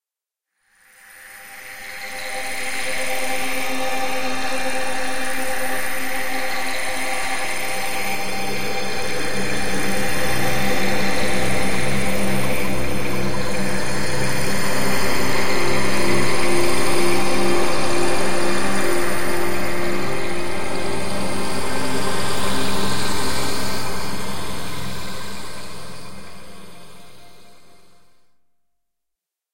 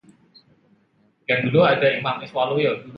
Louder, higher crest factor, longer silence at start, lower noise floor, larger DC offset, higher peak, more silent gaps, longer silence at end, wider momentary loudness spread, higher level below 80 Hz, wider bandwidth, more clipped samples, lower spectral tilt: second, -23 LUFS vs -20 LUFS; about the same, 14 dB vs 18 dB; second, 0 s vs 1.3 s; first, -87 dBFS vs -62 dBFS; first, 10% vs under 0.1%; about the same, -4 dBFS vs -6 dBFS; neither; about the same, 0 s vs 0 s; first, 11 LU vs 8 LU; first, -42 dBFS vs -62 dBFS; first, 16.5 kHz vs 5.8 kHz; neither; second, -3.5 dB/octave vs -8 dB/octave